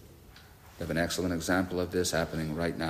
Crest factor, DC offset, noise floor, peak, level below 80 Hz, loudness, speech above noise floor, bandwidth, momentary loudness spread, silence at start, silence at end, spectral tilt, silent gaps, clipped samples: 16 dB; under 0.1%; -53 dBFS; -14 dBFS; -54 dBFS; -31 LUFS; 23 dB; 15.5 kHz; 4 LU; 0 s; 0 s; -4.5 dB/octave; none; under 0.1%